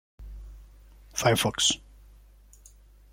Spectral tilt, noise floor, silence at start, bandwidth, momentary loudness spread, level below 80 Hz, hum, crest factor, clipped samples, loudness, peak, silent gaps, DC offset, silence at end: -2.5 dB/octave; -54 dBFS; 0.2 s; 16.5 kHz; 24 LU; -48 dBFS; none; 20 dB; under 0.1%; -25 LUFS; -10 dBFS; none; under 0.1%; 1.35 s